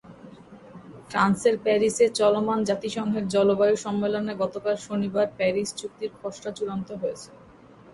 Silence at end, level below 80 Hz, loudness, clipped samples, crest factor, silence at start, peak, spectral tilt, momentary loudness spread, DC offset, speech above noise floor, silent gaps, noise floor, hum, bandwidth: 0.55 s; -62 dBFS; -25 LUFS; under 0.1%; 16 dB; 0.05 s; -10 dBFS; -5 dB/octave; 13 LU; under 0.1%; 26 dB; none; -50 dBFS; none; 11.5 kHz